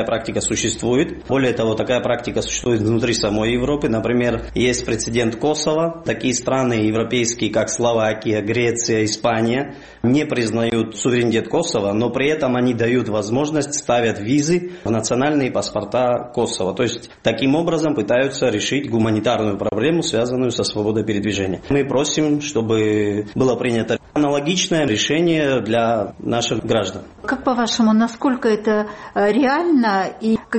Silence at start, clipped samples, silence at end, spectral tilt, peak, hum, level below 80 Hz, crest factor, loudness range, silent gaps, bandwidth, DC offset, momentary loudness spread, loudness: 0 s; under 0.1%; 0 s; -4.5 dB/octave; -2 dBFS; none; -44 dBFS; 16 dB; 1 LU; none; 8.8 kHz; 0.1%; 4 LU; -19 LUFS